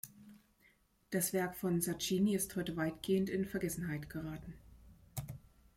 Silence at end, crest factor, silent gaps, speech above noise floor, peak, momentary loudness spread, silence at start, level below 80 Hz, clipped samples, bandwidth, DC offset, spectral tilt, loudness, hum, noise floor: 0.4 s; 18 dB; none; 34 dB; -22 dBFS; 17 LU; 0.05 s; -62 dBFS; under 0.1%; 16.5 kHz; under 0.1%; -5 dB/octave; -37 LUFS; none; -71 dBFS